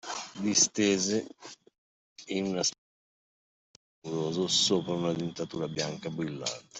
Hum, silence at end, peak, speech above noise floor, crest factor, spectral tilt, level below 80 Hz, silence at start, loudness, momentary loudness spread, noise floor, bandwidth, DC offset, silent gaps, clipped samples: none; 0 s; -10 dBFS; over 60 dB; 22 dB; -3 dB/octave; -70 dBFS; 0.05 s; -29 LUFS; 14 LU; under -90 dBFS; 8.2 kHz; under 0.1%; 1.78-2.16 s, 2.78-4.02 s; under 0.1%